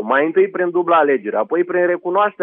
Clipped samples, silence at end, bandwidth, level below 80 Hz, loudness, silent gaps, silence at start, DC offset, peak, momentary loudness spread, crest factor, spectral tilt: under 0.1%; 0 s; 3.8 kHz; -78 dBFS; -17 LUFS; none; 0 s; under 0.1%; -4 dBFS; 4 LU; 14 dB; -9 dB/octave